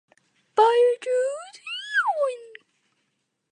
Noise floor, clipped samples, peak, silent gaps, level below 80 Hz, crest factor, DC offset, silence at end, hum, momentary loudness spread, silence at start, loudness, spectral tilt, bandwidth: -76 dBFS; under 0.1%; -6 dBFS; none; under -90 dBFS; 18 dB; under 0.1%; 1.05 s; none; 15 LU; 0.55 s; -23 LUFS; 0.5 dB/octave; 10 kHz